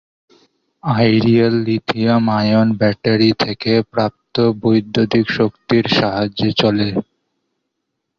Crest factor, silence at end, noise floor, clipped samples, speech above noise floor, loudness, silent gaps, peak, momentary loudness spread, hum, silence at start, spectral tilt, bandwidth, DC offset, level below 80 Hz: 14 dB; 1.15 s; -75 dBFS; under 0.1%; 60 dB; -16 LUFS; none; -2 dBFS; 6 LU; none; 0.85 s; -7.5 dB/octave; 6.8 kHz; under 0.1%; -48 dBFS